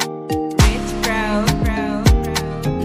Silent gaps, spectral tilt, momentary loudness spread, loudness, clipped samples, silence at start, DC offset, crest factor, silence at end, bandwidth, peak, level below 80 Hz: none; -5 dB/octave; 6 LU; -18 LUFS; under 0.1%; 0 s; under 0.1%; 16 dB; 0 s; 16 kHz; -2 dBFS; -22 dBFS